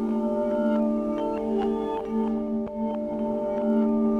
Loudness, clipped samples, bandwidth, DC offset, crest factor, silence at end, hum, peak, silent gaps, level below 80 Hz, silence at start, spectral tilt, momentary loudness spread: -26 LUFS; under 0.1%; 4.5 kHz; under 0.1%; 12 dB; 0 s; none; -14 dBFS; none; -52 dBFS; 0 s; -9 dB/octave; 5 LU